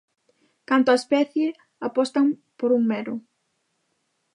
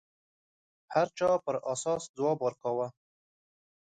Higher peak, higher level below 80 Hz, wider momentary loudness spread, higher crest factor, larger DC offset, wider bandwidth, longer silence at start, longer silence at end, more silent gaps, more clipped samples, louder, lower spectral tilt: first, -6 dBFS vs -12 dBFS; second, -80 dBFS vs -72 dBFS; first, 11 LU vs 5 LU; about the same, 18 dB vs 20 dB; neither; first, 11 kHz vs 9.4 kHz; second, 0.7 s vs 0.9 s; first, 1.15 s vs 1 s; second, none vs 2.09-2.14 s; neither; first, -23 LUFS vs -31 LUFS; about the same, -5 dB/octave vs -5 dB/octave